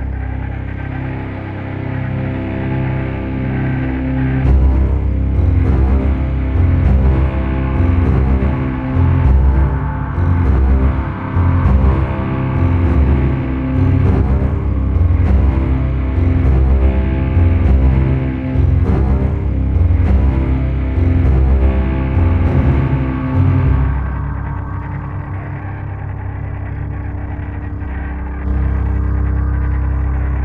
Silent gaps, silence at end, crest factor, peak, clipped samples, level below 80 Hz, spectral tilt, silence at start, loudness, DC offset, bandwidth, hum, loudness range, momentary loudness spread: none; 0 s; 12 dB; -2 dBFS; under 0.1%; -16 dBFS; -10.5 dB/octave; 0 s; -16 LUFS; under 0.1%; 3.8 kHz; none; 7 LU; 11 LU